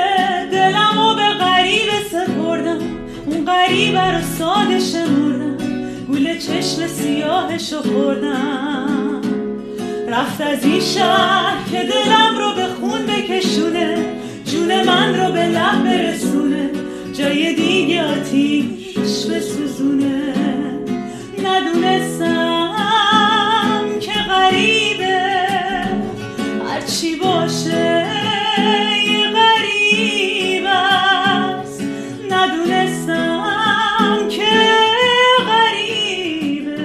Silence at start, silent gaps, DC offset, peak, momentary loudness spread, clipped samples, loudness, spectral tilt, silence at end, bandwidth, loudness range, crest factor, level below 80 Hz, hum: 0 s; none; under 0.1%; 0 dBFS; 10 LU; under 0.1%; -16 LUFS; -4 dB/octave; 0 s; 13.5 kHz; 5 LU; 16 dB; -50 dBFS; none